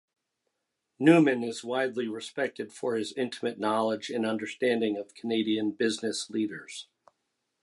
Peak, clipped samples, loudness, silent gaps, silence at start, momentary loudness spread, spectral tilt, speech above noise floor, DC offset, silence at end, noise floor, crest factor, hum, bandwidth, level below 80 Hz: -8 dBFS; under 0.1%; -29 LUFS; none; 1 s; 12 LU; -5 dB/octave; 54 dB; under 0.1%; 0.8 s; -83 dBFS; 20 dB; none; 11.5 kHz; -80 dBFS